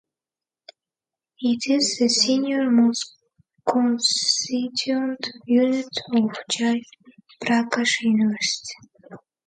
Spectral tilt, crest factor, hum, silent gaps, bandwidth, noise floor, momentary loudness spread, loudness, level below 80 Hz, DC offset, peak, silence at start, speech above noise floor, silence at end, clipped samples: -3 dB/octave; 18 dB; none; none; 9.4 kHz; under -90 dBFS; 10 LU; -21 LUFS; -72 dBFS; under 0.1%; -6 dBFS; 1.4 s; over 68 dB; 0.3 s; under 0.1%